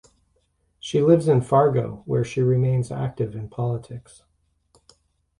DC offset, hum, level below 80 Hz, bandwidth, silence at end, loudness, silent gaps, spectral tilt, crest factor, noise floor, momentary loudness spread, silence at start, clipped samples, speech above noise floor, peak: under 0.1%; none; -54 dBFS; 11 kHz; 1.4 s; -22 LUFS; none; -8 dB/octave; 20 dB; -68 dBFS; 13 LU; 0.85 s; under 0.1%; 46 dB; -4 dBFS